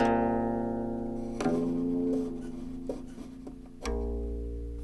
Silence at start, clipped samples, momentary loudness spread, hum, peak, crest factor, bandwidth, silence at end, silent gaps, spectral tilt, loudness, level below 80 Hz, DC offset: 0 s; under 0.1%; 14 LU; none; -14 dBFS; 18 dB; 11.5 kHz; 0 s; none; -7 dB/octave; -33 LUFS; -42 dBFS; under 0.1%